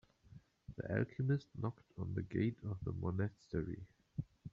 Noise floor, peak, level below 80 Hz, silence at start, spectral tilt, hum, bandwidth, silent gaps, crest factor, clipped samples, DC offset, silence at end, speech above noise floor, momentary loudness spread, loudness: -62 dBFS; -22 dBFS; -64 dBFS; 0.3 s; -8.5 dB/octave; none; 7.2 kHz; none; 20 dB; under 0.1%; under 0.1%; 0.05 s; 22 dB; 11 LU; -42 LUFS